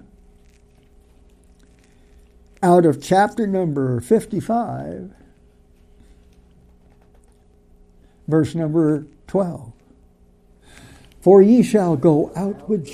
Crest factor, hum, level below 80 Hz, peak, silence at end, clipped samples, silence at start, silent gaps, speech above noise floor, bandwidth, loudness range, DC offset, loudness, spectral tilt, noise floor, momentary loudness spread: 20 dB; none; -52 dBFS; -2 dBFS; 0 s; under 0.1%; 2.6 s; none; 36 dB; 15 kHz; 10 LU; under 0.1%; -18 LUFS; -8 dB/octave; -53 dBFS; 14 LU